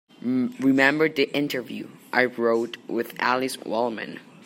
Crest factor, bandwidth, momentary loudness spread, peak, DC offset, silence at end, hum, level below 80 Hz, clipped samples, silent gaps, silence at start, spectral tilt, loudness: 22 dB; 16 kHz; 12 LU; -2 dBFS; under 0.1%; 0.25 s; none; -74 dBFS; under 0.1%; none; 0.25 s; -5 dB/octave; -24 LUFS